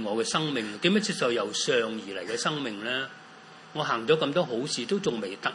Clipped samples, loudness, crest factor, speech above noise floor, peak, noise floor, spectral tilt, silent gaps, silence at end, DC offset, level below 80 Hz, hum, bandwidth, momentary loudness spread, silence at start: under 0.1%; -28 LUFS; 20 dB; 21 dB; -8 dBFS; -49 dBFS; -3.5 dB/octave; none; 0 s; under 0.1%; -74 dBFS; none; 11.5 kHz; 10 LU; 0 s